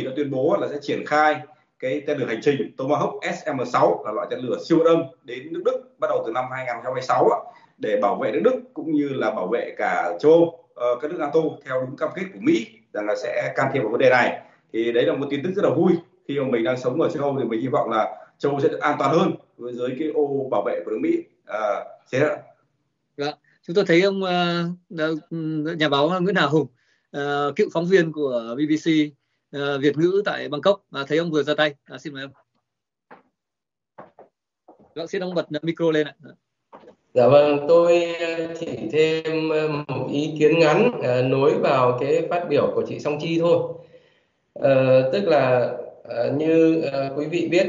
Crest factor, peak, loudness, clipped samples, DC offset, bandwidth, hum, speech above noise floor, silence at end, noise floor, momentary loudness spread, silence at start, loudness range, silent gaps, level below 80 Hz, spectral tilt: 18 dB; -4 dBFS; -22 LUFS; under 0.1%; under 0.1%; 7.6 kHz; none; 66 dB; 0 s; -88 dBFS; 11 LU; 0 s; 6 LU; none; -70 dBFS; -4.5 dB/octave